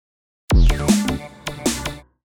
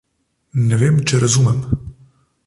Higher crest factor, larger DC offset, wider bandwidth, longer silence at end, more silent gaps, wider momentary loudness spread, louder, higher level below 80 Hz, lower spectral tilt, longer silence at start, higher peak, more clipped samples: about the same, 16 dB vs 14 dB; neither; first, 17.5 kHz vs 11.5 kHz; second, 0.4 s vs 0.55 s; neither; first, 14 LU vs 10 LU; second, -20 LUFS vs -16 LUFS; first, -22 dBFS vs -40 dBFS; about the same, -5 dB/octave vs -5.5 dB/octave; about the same, 0.5 s vs 0.55 s; about the same, -4 dBFS vs -4 dBFS; neither